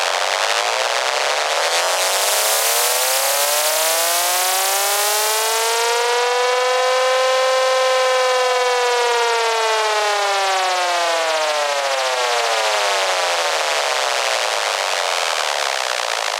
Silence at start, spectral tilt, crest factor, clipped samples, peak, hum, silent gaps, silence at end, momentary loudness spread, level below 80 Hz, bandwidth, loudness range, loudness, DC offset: 0 s; 4 dB/octave; 14 dB; under 0.1%; -4 dBFS; none; none; 0 s; 3 LU; -82 dBFS; 17 kHz; 2 LU; -17 LUFS; under 0.1%